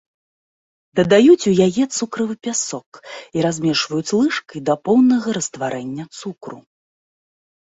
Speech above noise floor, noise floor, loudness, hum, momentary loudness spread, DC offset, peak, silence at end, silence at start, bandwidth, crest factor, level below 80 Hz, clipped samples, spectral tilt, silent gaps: over 72 dB; under -90 dBFS; -18 LUFS; none; 19 LU; under 0.1%; -2 dBFS; 1.15 s; 0.95 s; 8 kHz; 18 dB; -60 dBFS; under 0.1%; -4.5 dB/octave; 2.86-2.92 s